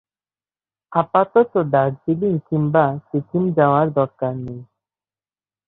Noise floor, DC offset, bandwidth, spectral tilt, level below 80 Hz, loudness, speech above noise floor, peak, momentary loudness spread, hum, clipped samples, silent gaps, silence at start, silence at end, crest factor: under -90 dBFS; under 0.1%; 4.1 kHz; -12 dB/octave; -58 dBFS; -19 LUFS; over 72 dB; -2 dBFS; 10 LU; none; under 0.1%; none; 0.9 s; 1.05 s; 18 dB